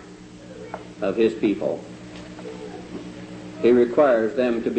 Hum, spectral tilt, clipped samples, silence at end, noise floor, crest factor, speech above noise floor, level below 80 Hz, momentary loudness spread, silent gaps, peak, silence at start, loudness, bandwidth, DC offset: none; -7 dB/octave; under 0.1%; 0 s; -42 dBFS; 16 dB; 22 dB; -56 dBFS; 21 LU; none; -6 dBFS; 0 s; -21 LUFS; 8.6 kHz; under 0.1%